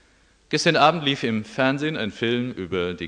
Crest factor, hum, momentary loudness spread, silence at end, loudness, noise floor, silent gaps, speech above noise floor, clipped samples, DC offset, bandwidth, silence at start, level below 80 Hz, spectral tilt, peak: 22 dB; none; 9 LU; 0 s; -22 LUFS; -58 dBFS; none; 36 dB; under 0.1%; under 0.1%; 10 kHz; 0.5 s; -58 dBFS; -4.5 dB/octave; -2 dBFS